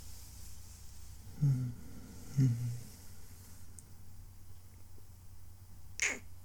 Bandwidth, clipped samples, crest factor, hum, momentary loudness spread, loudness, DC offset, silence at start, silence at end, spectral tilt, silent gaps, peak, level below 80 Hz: 19 kHz; under 0.1%; 20 dB; none; 24 LU; -35 LUFS; under 0.1%; 0 s; 0 s; -5 dB/octave; none; -18 dBFS; -56 dBFS